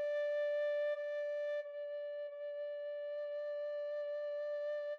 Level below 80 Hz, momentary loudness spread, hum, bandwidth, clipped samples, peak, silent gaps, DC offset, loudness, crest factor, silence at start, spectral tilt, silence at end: under -90 dBFS; 8 LU; none; 6.2 kHz; under 0.1%; -32 dBFS; none; under 0.1%; -40 LUFS; 8 dB; 0 s; 1 dB/octave; 0 s